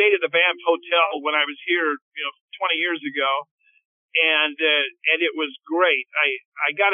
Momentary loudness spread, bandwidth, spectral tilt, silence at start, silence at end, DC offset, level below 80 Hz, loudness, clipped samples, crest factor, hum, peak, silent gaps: 9 LU; 3.8 kHz; 2.5 dB/octave; 0 s; 0 s; under 0.1%; under -90 dBFS; -21 LUFS; under 0.1%; 18 dB; none; -4 dBFS; 2.02-2.11 s, 2.41-2.48 s, 3.51-3.58 s, 3.85-4.09 s, 6.45-6.52 s